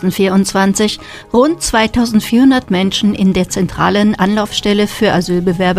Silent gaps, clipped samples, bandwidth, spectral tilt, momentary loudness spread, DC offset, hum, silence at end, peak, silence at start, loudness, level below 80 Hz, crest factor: none; under 0.1%; 15.5 kHz; -5 dB/octave; 5 LU; under 0.1%; none; 0 s; 0 dBFS; 0 s; -13 LUFS; -36 dBFS; 12 dB